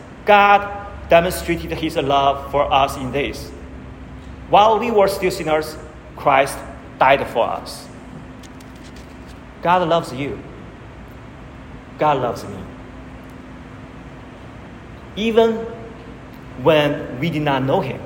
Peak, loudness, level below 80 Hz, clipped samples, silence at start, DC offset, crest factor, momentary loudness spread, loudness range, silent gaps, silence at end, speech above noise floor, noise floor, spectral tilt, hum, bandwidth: 0 dBFS; -18 LUFS; -40 dBFS; under 0.1%; 0 s; under 0.1%; 20 dB; 23 LU; 9 LU; none; 0 s; 20 dB; -37 dBFS; -5.5 dB/octave; none; 16.5 kHz